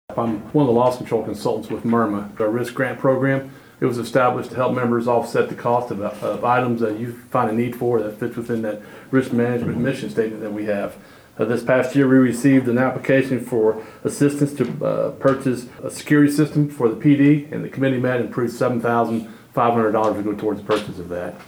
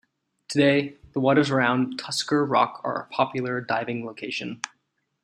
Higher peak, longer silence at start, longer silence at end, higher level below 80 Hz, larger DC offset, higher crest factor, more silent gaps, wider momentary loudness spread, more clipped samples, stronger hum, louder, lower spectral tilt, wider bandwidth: about the same, -4 dBFS vs -6 dBFS; second, 0.1 s vs 0.5 s; second, 0.05 s vs 0.55 s; first, -58 dBFS vs -66 dBFS; neither; about the same, 14 dB vs 18 dB; neither; about the same, 10 LU vs 11 LU; neither; neither; first, -20 LUFS vs -24 LUFS; first, -7 dB/octave vs -5 dB/octave; first, 17.5 kHz vs 15 kHz